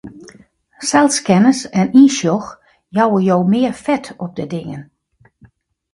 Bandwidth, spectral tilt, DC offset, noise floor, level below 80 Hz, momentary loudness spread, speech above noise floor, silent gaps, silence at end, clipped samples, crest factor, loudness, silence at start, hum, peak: 11.5 kHz; -5 dB/octave; under 0.1%; -54 dBFS; -56 dBFS; 16 LU; 40 dB; none; 1.1 s; under 0.1%; 16 dB; -15 LUFS; 0.05 s; none; 0 dBFS